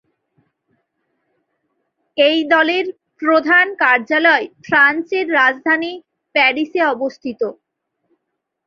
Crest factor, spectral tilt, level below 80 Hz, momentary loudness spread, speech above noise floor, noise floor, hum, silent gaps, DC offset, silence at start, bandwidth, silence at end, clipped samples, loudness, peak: 16 dB; -4 dB/octave; -68 dBFS; 12 LU; 61 dB; -76 dBFS; none; none; under 0.1%; 2.15 s; 7 kHz; 1.15 s; under 0.1%; -15 LUFS; -2 dBFS